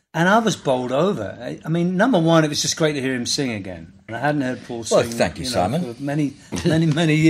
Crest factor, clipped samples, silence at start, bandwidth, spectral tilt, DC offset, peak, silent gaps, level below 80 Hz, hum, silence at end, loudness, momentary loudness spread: 18 dB; under 0.1%; 0.15 s; 15 kHz; -5 dB/octave; under 0.1%; -2 dBFS; none; -52 dBFS; none; 0 s; -20 LUFS; 11 LU